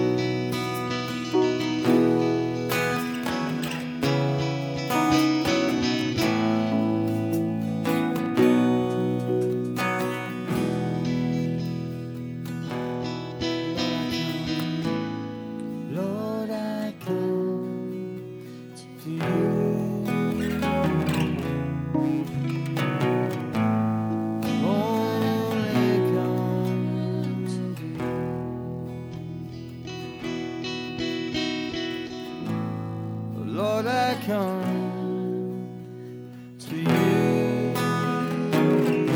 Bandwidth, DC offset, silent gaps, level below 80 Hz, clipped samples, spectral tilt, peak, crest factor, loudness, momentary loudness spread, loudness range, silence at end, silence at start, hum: over 20 kHz; under 0.1%; none; -54 dBFS; under 0.1%; -6.5 dB/octave; -8 dBFS; 18 dB; -26 LUFS; 12 LU; 6 LU; 0 s; 0 s; none